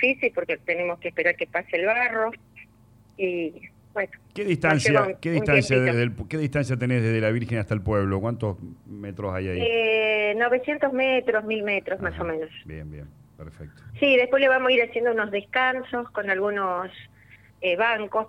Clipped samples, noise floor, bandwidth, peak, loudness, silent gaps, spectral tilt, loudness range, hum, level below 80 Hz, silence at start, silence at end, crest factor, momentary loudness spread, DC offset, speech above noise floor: under 0.1%; -55 dBFS; 11.5 kHz; -6 dBFS; -24 LUFS; none; -6 dB/octave; 4 LU; none; -52 dBFS; 0 s; 0 s; 18 dB; 14 LU; under 0.1%; 31 dB